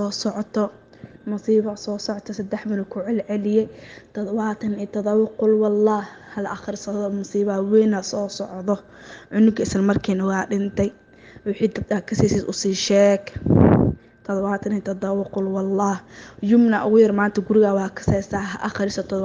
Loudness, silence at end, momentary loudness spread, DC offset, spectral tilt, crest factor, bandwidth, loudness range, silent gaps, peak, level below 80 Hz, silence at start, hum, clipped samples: -21 LUFS; 0 s; 12 LU; under 0.1%; -6.5 dB/octave; 20 dB; 9.6 kHz; 5 LU; none; 0 dBFS; -46 dBFS; 0 s; none; under 0.1%